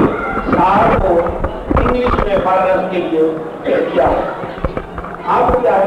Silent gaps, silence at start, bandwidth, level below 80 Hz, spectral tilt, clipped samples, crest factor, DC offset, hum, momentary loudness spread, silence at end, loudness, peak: none; 0 s; 10.5 kHz; -26 dBFS; -8 dB/octave; under 0.1%; 12 dB; under 0.1%; none; 10 LU; 0 s; -15 LUFS; -2 dBFS